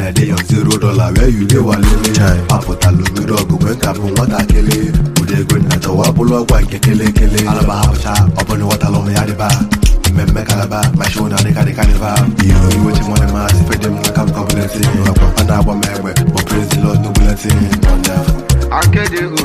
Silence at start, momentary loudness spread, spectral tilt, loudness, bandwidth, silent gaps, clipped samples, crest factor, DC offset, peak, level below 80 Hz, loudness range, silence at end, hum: 0 s; 3 LU; -5.5 dB/octave; -12 LUFS; 15.5 kHz; none; under 0.1%; 10 dB; under 0.1%; 0 dBFS; -16 dBFS; 1 LU; 0 s; none